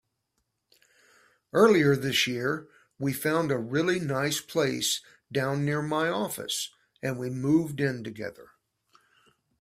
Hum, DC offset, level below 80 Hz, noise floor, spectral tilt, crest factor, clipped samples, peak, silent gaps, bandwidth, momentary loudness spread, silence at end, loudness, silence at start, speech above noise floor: none; under 0.1%; -66 dBFS; -79 dBFS; -4.5 dB/octave; 20 dB; under 0.1%; -8 dBFS; none; 16 kHz; 12 LU; 1.15 s; -27 LUFS; 1.55 s; 52 dB